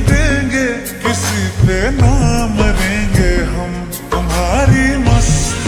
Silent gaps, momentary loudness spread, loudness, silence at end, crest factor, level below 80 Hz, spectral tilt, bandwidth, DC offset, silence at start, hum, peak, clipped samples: none; 7 LU; -14 LUFS; 0 s; 12 dB; -18 dBFS; -5 dB/octave; over 20 kHz; under 0.1%; 0 s; none; 0 dBFS; under 0.1%